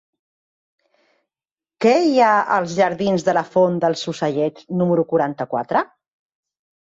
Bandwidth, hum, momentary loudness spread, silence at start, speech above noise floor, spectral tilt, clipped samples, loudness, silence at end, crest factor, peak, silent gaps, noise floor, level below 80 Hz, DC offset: 8 kHz; none; 8 LU; 1.8 s; over 72 dB; -6 dB/octave; under 0.1%; -19 LUFS; 1 s; 16 dB; -4 dBFS; none; under -90 dBFS; -64 dBFS; under 0.1%